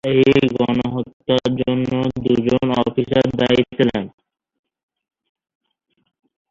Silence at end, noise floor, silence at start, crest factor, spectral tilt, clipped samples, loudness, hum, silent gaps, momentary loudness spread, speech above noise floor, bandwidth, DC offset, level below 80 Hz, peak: 2.4 s; -69 dBFS; 0.05 s; 18 dB; -7.5 dB/octave; under 0.1%; -18 LUFS; none; 1.13-1.20 s; 7 LU; 54 dB; 7.4 kHz; under 0.1%; -48 dBFS; -2 dBFS